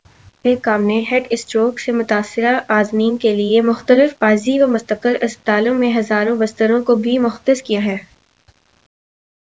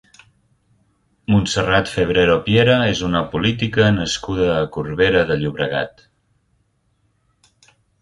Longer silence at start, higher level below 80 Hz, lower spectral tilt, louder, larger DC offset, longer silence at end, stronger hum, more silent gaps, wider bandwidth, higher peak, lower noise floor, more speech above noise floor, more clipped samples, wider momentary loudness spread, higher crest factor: second, 0.45 s vs 1.3 s; second, -60 dBFS vs -40 dBFS; about the same, -5.5 dB/octave vs -5.5 dB/octave; about the same, -16 LUFS vs -17 LUFS; first, 0.1% vs under 0.1%; second, 1.45 s vs 2.1 s; neither; neither; second, 8 kHz vs 11.5 kHz; about the same, 0 dBFS vs 0 dBFS; second, -55 dBFS vs -64 dBFS; second, 40 dB vs 47 dB; neither; about the same, 5 LU vs 7 LU; about the same, 16 dB vs 18 dB